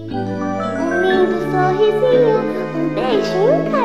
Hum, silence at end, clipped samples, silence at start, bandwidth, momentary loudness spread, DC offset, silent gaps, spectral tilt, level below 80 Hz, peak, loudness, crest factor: none; 0 s; under 0.1%; 0 s; 12.5 kHz; 8 LU; 0.8%; none; -7 dB/octave; -50 dBFS; -4 dBFS; -16 LUFS; 12 dB